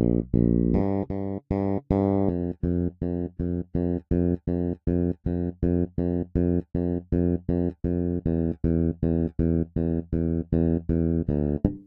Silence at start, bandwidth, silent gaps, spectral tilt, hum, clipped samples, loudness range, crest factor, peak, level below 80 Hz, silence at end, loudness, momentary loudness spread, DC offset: 0 s; 2.8 kHz; none; -13 dB/octave; none; under 0.1%; 2 LU; 20 dB; -4 dBFS; -36 dBFS; 0.05 s; -26 LUFS; 5 LU; under 0.1%